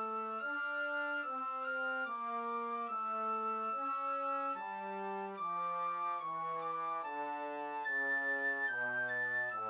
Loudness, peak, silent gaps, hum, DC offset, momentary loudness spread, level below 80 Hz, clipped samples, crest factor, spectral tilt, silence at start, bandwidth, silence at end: -37 LUFS; -26 dBFS; none; none; under 0.1%; 7 LU; under -90 dBFS; under 0.1%; 12 dB; -1.5 dB/octave; 0 s; 4 kHz; 0 s